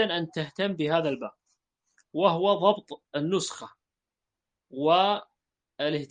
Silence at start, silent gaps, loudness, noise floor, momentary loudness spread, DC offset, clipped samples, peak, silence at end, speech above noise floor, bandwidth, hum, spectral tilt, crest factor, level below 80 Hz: 0 s; none; -27 LUFS; -88 dBFS; 14 LU; under 0.1%; under 0.1%; -8 dBFS; 0.05 s; 62 dB; 9.6 kHz; none; -5 dB/octave; 20 dB; -74 dBFS